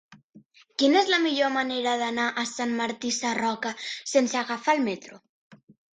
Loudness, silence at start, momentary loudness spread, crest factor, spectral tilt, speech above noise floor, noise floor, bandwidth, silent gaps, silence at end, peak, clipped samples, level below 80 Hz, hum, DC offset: -25 LUFS; 0.1 s; 9 LU; 18 dB; -2 dB/octave; 30 dB; -55 dBFS; 9.6 kHz; 0.24-0.30 s, 0.46-0.50 s, 5.29-5.50 s; 0.4 s; -8 dBFS; under 0.1%; -74 dBFS; none; under 0.1%